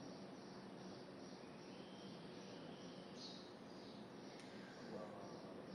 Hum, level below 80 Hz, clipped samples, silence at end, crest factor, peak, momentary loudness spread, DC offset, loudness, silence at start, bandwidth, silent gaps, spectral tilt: none; -86 dBFS; under 0.1%; 0 s; 16 dB; -40 dBFS; 3 LU; under 0.1%; -55 LUFS; 0 s; 11.5 kHz; none; -5 dB/octave